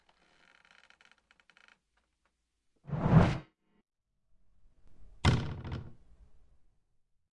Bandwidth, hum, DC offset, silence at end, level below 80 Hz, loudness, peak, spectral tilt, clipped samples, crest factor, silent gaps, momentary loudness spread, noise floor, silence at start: 11 kHz; none; under 0.1%; 1.45 s; -50 dBFS; -30 LUFS; -10 dBFS; -7 dB/octave; under 0.1%; 24 dB; none; 19 LU; -80 dBFS; 2.9 s